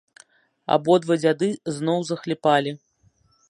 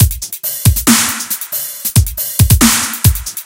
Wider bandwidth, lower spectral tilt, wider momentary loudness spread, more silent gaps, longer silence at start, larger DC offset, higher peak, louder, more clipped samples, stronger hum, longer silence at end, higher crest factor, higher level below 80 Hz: second, 11.5 kHz vs over 20 kHz; first, -5.5 dB/octave vs -3.5 dB/octave; about the same, 11 LU vs 9 LU; neither; first, 0.7 s vs 0 s; neither; second, -4 dBFS vs 0 dBFS; second, -22 LUFS vs -12 LUFS; second, under 0.1% vs 0.5%; neither; first, 0.75 s vs 0 s; first, 20 dB vs 12 dB; second, -70 dBFS vs -22 dBFS